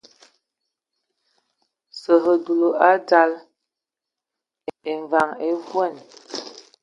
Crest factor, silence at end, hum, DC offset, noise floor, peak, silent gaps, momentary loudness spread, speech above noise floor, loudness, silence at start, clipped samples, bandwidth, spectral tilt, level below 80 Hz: 22 dB; 0.25 s; none; under 0.1%; -87 dBFS; -2 dBFS; none; 20 LU; 68 dB; -20 LUFS; 1.95 s; under 0.1%; 8 kHz; -4.5 dB/octave; -76 dBFS